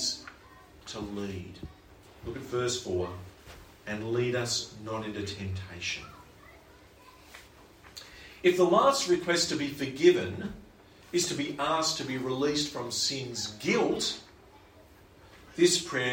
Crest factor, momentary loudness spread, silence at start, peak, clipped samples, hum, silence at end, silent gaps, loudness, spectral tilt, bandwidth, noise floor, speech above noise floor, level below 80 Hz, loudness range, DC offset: 22 dB; 23 LU; 0 s; -8 dBFS; under 0.1%; none; 0 s; none; -29 LUFS; -3.5 dB/octave; 16.5 kHz; -55 dBFS; 26 dB; -60 dBFS; 10 LU; under 0.1%